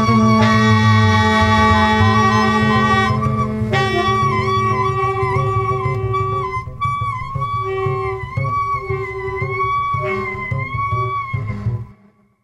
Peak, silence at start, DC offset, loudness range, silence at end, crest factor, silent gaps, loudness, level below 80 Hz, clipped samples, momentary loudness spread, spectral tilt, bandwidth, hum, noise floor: -2 dBFS; 0 s; under 0.1%; 8 LU; 0.5 s; 14 dB; none; -17 LUFS; -36 dBFS; under 0.1%; 10 LU; -6.5 dB/octave; 11 kHz; none; -52 dBFS